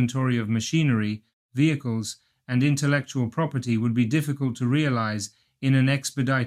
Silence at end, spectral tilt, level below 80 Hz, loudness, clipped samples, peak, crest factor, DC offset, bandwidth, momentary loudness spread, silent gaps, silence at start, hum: 0 s; -6 dB/octave; -64 dBFS; -24 LUFS; under 0.1%; -8 dBFS; 16 dB; under 0.1%; 14.5 kHz; 9 LU; 1.33-1.49 s; 0 s; none